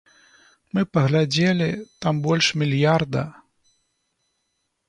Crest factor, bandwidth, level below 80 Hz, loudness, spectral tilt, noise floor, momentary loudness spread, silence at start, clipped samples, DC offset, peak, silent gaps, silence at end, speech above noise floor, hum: 18 dB; 10.5 kHz; -58 dBFS; -21 LUFS; -5.5 dB/octave; -74 dBFS; 8 LU; 0.75 s; under 0.1%; under 0.1%; -6 dBFS; none; 1.55 s; 54 dB; none